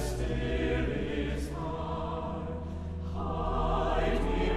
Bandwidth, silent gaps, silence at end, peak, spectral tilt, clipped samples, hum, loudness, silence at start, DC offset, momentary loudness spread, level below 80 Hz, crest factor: 13.5 kHz; none; 0 s; -16 dBFS; -6.5 dB/octave; under 0.1%; none; -33 LUFS; 0 s; under 0.1%; 8 LU; -36 dBFS; 14 dB